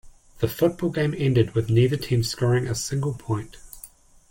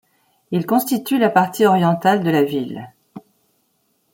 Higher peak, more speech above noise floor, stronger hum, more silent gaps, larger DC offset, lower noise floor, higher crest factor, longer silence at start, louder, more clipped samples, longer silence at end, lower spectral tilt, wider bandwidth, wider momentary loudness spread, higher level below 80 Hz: second, -8 dBFS vs -2 dBFS; second, 26 dB vs 49 dB; neither; neither; neither; second, -48 dBFS vs -66 dBFS; about the same, 16 dB vs 18 dB; second, 0.05 s vs 0.5 s; second, -24 LUFS vs -17 LUFS; neither; second, 0.45 s vs 0.95 s; about the same, -6 dB/octave vs -6 dB/octave; about the same, 17 kHz vs 17 kHz; about the same, 14 LU vs 12 LU; first, -48 dBFS vs -64 dBFS